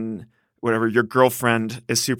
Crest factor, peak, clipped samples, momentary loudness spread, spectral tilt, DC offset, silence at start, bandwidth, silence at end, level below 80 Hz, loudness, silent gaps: 20 dB; -2 dBFS; under 0.1%; 12 LU; -4 dB/octave; under 0.1%; 0 s; 18.5 kHz; 0 s; -64 dBFS; -20 LUFS; none